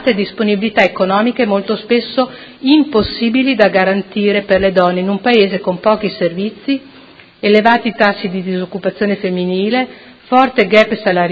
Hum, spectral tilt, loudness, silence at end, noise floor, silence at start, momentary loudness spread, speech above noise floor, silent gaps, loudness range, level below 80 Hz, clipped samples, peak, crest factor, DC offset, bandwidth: none; -7 dB/octave; -14 LUFS; 0 s; -41 dBFS; 0 s; 9 LU; 27 dB; none; 2 LU; -46 dBFS; under 0.1%; 0 dBFS; 14 dB; under 0.1%; 7.6 kHz